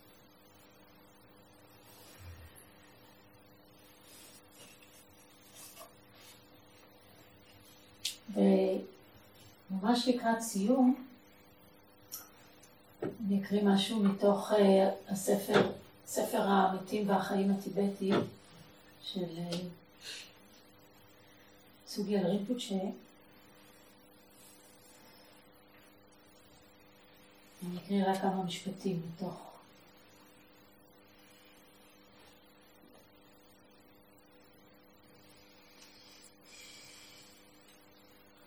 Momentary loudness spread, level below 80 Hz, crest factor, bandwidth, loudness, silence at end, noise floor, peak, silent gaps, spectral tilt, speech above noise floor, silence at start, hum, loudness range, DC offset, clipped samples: 27 LU; -74 dBFS; 24 dB; 20 kHz; -33 LUFS; 1.25 s; -62 dBFS; -12 dBFS; none; -5.5 dB/octave; 31 dB; 2 s; none; 25 LU; under 0.1%; under 0.1%